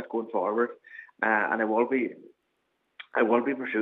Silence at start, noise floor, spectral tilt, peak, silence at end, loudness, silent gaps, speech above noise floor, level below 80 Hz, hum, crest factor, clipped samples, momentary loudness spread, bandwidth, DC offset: 0 s; -76 dBFS; -8 dB/octave; -8 dBFS; 0 s; -27 LUFS; none; 49 dB; -88 dBFS; none; 20 dB; under 0.1%; 9 LU; 4.1 kHz; under 0.1%